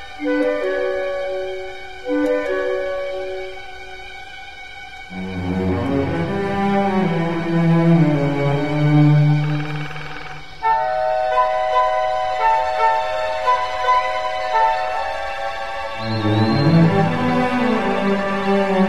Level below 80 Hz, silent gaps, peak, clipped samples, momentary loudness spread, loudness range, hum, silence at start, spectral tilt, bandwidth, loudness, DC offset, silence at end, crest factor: -44 dBFS; none; -2 dBFS; under 0.1%; 16 LU; 8 LU; none; 0 s; -7.5 dB/octave; 10.5 kHz; -19 LUFS; 2%; 0 s; 16 dB